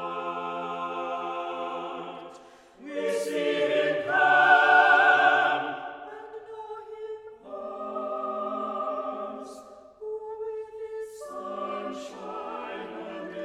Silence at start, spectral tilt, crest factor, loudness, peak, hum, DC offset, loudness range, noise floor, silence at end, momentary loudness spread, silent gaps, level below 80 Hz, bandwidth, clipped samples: 0 s; -3.5 dB/octave; 20 dB; -25 LUFS; -6 dBFS; none; under 0.1%; 15 LU; -51 dBFS; 0 s; 23 LU; none; -74 dBFS; 13 kHz; under 0.1%